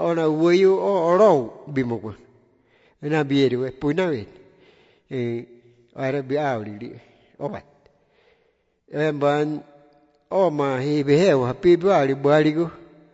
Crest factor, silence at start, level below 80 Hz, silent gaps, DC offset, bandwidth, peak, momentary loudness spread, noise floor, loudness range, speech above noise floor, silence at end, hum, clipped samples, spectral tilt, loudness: 16 dB; 0 s; -60 dBFS; none; under 0.1%; 8 kHz; -6 dBFS; 16 LU; -66 dBFS; 10 LU; 46 dB; 0.3 s; none; under 0.1%; -7 dB/octave; -21 LUFS